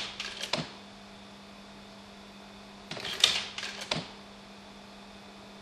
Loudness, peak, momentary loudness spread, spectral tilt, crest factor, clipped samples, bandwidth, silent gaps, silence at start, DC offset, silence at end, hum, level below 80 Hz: -31 LUFS; -2 dBFS; 23 LU; -1.5 dB/octave; 34 dB; under 0.1%; 15 kHz; none; 0 s; under 0.1%; 0 s; none; -64 dBFS